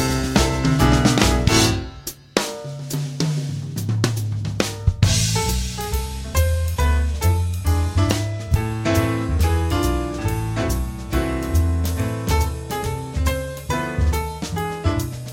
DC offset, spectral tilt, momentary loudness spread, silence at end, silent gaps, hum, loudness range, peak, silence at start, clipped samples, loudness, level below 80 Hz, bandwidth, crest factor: under 0.1%; -5 dB/octave; 9 LU; 0 s; none; none; 4 LU; -4 dBFS; 0 s; under 0.1%; -21 LUFS; -28 dBFS; 16.5 kHz; 18 dB